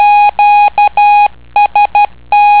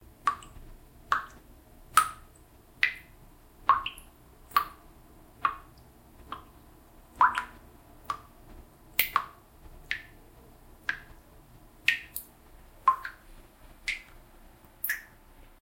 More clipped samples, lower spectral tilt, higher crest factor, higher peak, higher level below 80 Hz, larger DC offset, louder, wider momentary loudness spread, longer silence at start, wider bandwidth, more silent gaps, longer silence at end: neither; first, -4.5 dB/octave vs -1 dB/octave; second, 8 dB vs 32 dB; about the same, 0 dBFS vs -2 dBFS; first, -42 dBFS vs -56 dBFS; first, 2% vs under 0.1%; first, -8 LUFS vs -30 LUFS; second, 4 LU vs 19 LU; second, 0 s vs 0.25 s; second, 4 kHz vs 16.5 kHz; neither; second, 0 s vs 0.6 s